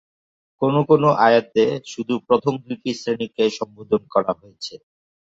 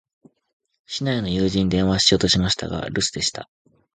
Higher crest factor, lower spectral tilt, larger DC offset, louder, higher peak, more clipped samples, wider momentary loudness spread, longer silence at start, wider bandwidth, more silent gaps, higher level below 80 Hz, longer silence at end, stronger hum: about the same, 18 dB vs 20 dB; first, -6 dB/octave vs -4 dB/octave; neither; about the same, -20 LUFS vs -20 LUFS; about the same, -2 dBFS vs -2 dBFS; neither; first, 14 LU vs 10 LU; second, 0.6 s vs 0.9 s; second, 7.8 kHz vs 9.6 kHz; neither; second, -64 dBFS vs -42 dBFS; about the same, 0.45 s vs 0.5 s; neither